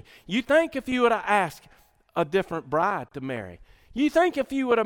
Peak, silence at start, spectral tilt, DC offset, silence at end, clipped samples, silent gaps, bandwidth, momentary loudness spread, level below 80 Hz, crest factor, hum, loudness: -8 dBFS; 0.3 s; -5.5 dB/octave; under 0.1%; 0 s; under 0.1%; none; 18.5 kHz; 12 LU; -56 dBFS; 18 dB; none; -25 LUFS